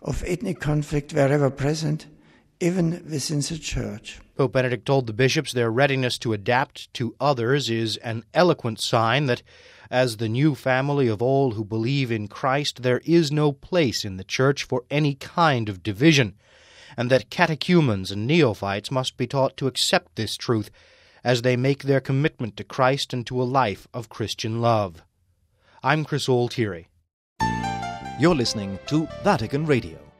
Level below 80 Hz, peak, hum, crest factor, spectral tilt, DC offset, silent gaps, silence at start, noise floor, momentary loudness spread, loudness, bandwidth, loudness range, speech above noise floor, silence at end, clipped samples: -48 dBFS; -2 dBFS; none; 20 dB; -5.5 dB/octave; under 0.1%; 27.13-27.36 s; 0 s; -66 dBFS; 9 LU; -23 LUFS; 15 kHz; 4 LU; 43 dB; 0.15 s; under 0.1%